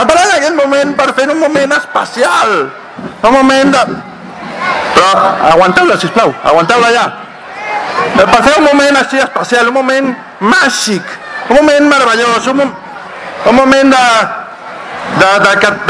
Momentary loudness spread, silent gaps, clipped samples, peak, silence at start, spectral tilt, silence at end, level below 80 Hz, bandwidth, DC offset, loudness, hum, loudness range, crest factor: 16 LU; none; 2%; 0 dBFS; 0 s; -3.5 dB/octave; 0 s; -42 dBFS; 11 kHz; under 0.1%; -8 LUFS; none; 2 LU; 10 dB